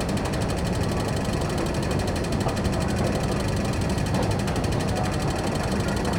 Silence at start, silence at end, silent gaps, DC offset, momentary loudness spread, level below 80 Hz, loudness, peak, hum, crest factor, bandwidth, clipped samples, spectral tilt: 0 s; 0 s; none; under 0.1%; 1 LU; -34 dBFS; -25 LUFS; -12 dBFS; none; 12 dB; 18 kHz; under 0.1%; -5.5 dB/octave